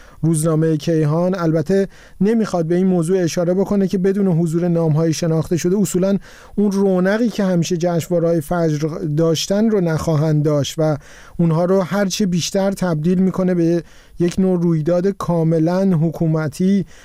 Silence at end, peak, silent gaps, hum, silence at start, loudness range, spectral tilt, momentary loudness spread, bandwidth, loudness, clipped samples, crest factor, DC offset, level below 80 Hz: 0.05 s; -8 dBFS; none; none; 0.2 s; 1 LU; -6.5 dB/octave; 3 LU; 15.5 kHz; -17 LUFS; under 0.1%; 8 dB; 0.1%; -44 dBFS